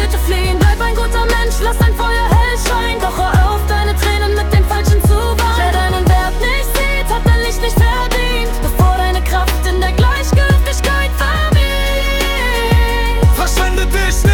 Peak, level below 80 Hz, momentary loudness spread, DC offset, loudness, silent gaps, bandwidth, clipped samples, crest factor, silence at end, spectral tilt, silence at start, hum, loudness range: -2 dBFS; -14 dBFS; 3 LU; under 0.1%; -14 LUFS; none; 18 kHz; under 0.1%; 10 dB; 0 s; -5 dB/octave; 0 s; none; 1 LU